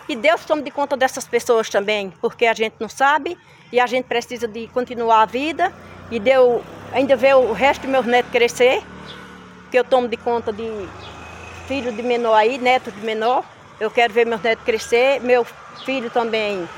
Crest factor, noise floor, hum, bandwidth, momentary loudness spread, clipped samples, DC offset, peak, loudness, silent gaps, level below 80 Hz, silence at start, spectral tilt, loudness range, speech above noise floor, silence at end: 16 dB; -40 dBFS; none; 16.5 kHz; 14 LU; under 0.1%; under 0.1%; -2 dBFS; -19 LUFS; none; -54 dBFS; 0 s; -3.5 dB/octave; 4 LU; 22 dB; 0 s